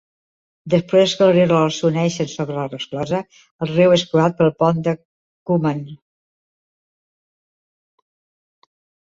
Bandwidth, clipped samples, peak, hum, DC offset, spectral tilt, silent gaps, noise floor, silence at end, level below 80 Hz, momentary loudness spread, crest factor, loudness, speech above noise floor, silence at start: 7.8 kHz; under 0.1%; -2 dBFS; none; under 0.1%; -6 dB/octave; 3.51-3.59 s, 5.05-5.46 s; under -90 dBFS; 3.2 s; -58 dBFS; 12 LU; 18 dB; -18 LUFS; over 73 dB; 0.65 s